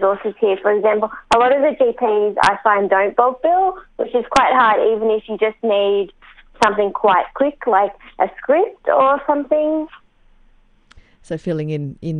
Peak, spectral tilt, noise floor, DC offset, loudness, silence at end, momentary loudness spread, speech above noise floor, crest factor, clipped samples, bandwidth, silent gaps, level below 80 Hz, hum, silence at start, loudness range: 0 dBFS; -5.5 dB/octave; -51 dBFS; under 0.1%; -17 LUFS; 0 s; 8 LU; 35 dB; 18 dB; under 0.1%; 10 kHz; none; -50 dBFS; none; 0 s; 4 LU